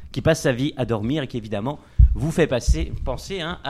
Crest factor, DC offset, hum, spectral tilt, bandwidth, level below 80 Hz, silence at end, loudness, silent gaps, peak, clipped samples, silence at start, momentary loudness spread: 18 dB; under 0.1%; none; -6 dB/octave; 13.5 kHz; -24 dBFS; 0 s; -23 LUFS; none; -2 dBFS; under 0.1%; 0 s; 9 LU